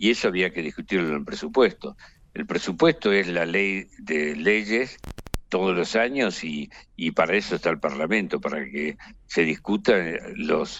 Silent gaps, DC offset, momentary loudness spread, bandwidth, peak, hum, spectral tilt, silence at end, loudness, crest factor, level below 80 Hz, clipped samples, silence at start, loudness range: none; under 0.1%; 11 LU; 16 kHz; -6 dBFS; none; -5 dB/octave; 0 s; -24 LUFS; 18 dB; -48 dBFS; under 0.1%; 0 s; 2 LU